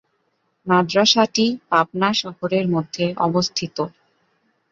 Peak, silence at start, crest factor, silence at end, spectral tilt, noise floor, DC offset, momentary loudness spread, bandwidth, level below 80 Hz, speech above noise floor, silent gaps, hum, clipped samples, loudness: -2 dBFS; 0.65 s; 18 dB; 0.8 s; -4.5 dB/octave; -69 dBFS; under 0.1%; 11 LU; 7.6 kHz; -62 dBFS; 49 dB; none; none; under 0.1%; -19 LUFS